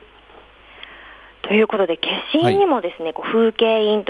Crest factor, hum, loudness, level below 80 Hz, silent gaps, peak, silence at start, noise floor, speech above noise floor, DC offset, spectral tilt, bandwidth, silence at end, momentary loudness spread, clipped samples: 16 dB; none; -18 LUFS; -56 dBFS; none; -4 dBFS; 0.8 s; -46 dBFS; 29 dB; under 0.1%; -6.5 dB/octave; 11 kHz; 0.05 s; 22 LU; under 0.1%